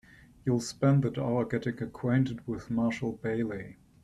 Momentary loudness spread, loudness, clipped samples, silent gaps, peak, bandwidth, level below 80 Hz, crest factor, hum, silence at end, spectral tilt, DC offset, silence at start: 10 LU; -30 LUFS; under 0.1%; none; -14 dBFS; 12 kHz; -58 dBFS; 16 dB; none; 0.3 s; -7 dB/octave; under 0.1%; 0.45 s